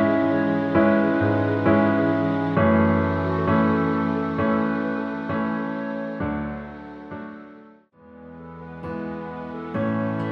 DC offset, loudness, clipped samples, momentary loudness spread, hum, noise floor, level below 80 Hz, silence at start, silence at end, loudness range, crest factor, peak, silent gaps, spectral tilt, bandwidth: under 0.1%; -23 LUFS; under 0.1%; 18 LU; none; -50 dBFS; -50 dBFS; 0 s; 0 s; 14 LU; 16 dB; -6 dBFS; none; -9.5 dB/octave; 5.8 kHz